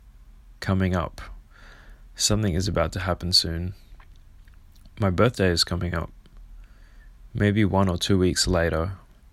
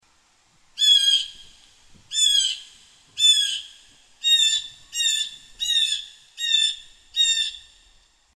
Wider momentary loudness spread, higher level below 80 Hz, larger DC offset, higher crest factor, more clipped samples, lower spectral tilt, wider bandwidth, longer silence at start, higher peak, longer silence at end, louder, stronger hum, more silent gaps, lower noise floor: about the same, 14 LU vs 16 LU; first, -40 dBFS vs -62 dBFS; neither; about the same, 22 dB vs 18 dB; neither; first, -4.5 dB/octave vs 5.5 dB/octave; about the same, 15 kHz vs 14 kHz; second, 0.05 s vs 0.75 s; about the same, -4 dBFS vs -6 dBFS; second, 0.35 s vs 0.75 s; second, -23 LUFS vs -19 LUFS; neither; neither; second, -48 dBFS vs -61 dBFS